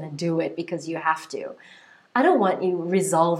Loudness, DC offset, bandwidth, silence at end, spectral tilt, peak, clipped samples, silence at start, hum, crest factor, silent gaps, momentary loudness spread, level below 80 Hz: -24 LUFS; under 0.1%; 15 kHz; 0 s; -5.5 dB/octave; -6 dBFS; under 0.1%; 0 s; none; 18 dB; none; 13 LU; -80 dBFS